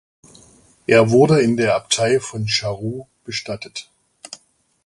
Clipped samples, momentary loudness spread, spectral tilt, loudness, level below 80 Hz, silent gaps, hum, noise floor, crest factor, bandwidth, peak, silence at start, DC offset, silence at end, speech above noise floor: under 0.1%; 22 LU; -4.5 dB/octave; -18 LUFS; -54 dBFS; none; none; -54 dBFS; 20 dB; 11.5 kHz; 0 dBFS; 0.9 s; under 0.1%; 0.5 s; 37 dB